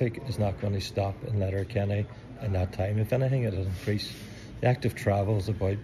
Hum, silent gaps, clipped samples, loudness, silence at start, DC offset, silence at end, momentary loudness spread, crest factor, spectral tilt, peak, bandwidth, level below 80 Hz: none; none; under 0.1%; -29 LUFS; 0 s; under 0.1%; 0 s; 6 LU; 18 dB; -7 dB/octave; -12 dBFS; 14 kHz; -50 dBFS